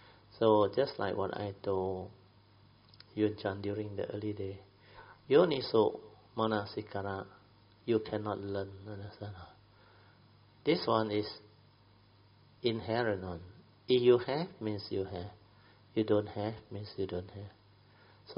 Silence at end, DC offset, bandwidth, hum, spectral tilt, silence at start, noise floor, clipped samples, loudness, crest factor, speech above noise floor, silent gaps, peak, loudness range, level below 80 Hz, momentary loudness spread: 0.05 s; under 0.1%; 5.6 kHz; none; -5 dB/octave; 0.35 s; -63 dBFS; under 0.1%; -34 LUFS; 22 dB; 30 dB; none; -12 dBFS; 6 LU; -68 dBFS; 19 LU